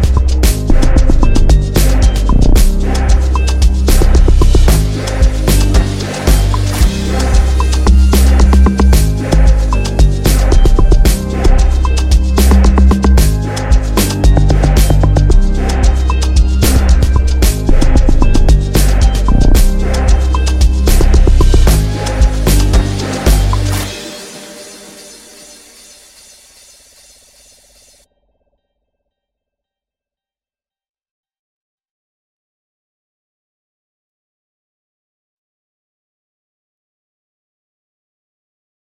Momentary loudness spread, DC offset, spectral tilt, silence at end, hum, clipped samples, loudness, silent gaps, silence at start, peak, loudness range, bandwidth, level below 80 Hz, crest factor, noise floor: 5 LU; under 0.1%; -5.5 dB/octave; 14.2 s; none; under 0.1%; -12 LUFS; none; 0 s; 0 dBFS; 4 LU; 15 kHz; -10 dBFS; 10 dB; under -90 dBFS